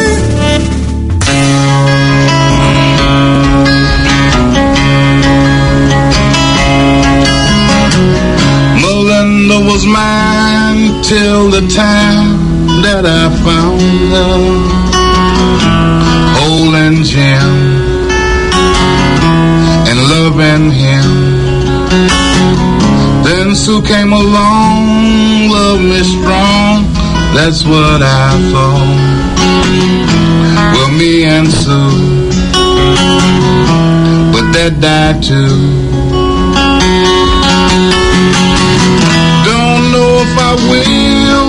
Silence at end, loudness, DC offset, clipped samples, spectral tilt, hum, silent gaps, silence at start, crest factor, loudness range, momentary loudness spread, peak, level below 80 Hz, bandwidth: 0 s; -7 LUFS; under 0.1%; 0.6%; -5.5 dB/octave; none; none; 0 s; 8 dB; 1 LU; 3 LU; 0 dBFS; -18 dBFS; 11 kHz